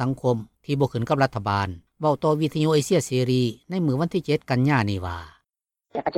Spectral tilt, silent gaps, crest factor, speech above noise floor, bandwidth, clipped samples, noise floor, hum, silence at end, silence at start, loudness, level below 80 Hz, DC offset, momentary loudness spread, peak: -6.5 dB/octave; none; 16 dB; 61 dB; 15.5 kHz; under 0.1%; -84 dBFS; none; 0 s; 0 s; -24 LUFS; -56 dBFS; under 0.1%; 9 LU; -8 dBFS